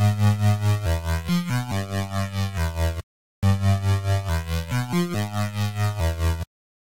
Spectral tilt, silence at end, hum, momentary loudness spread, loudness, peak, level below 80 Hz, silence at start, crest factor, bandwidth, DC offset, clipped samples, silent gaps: -6 dB/octave; 0.4 s; none; 6 LU; -24 LUFS; -8 dBFS; -34 dBFS; 0 s; 16 dB; 17 kHz; 0.8%; under 0.1%; 3.03-3.42 s